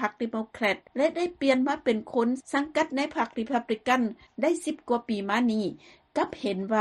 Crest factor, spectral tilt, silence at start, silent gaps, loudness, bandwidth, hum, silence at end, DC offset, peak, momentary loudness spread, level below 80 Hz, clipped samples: 18 dB; -5 dB/octave; 0 s; none; -28 LUFS; 12.5 kHz; none; 0 s; under 0.1%; -8 dBFS; 6 LU; -66 dBFS; under 0.1%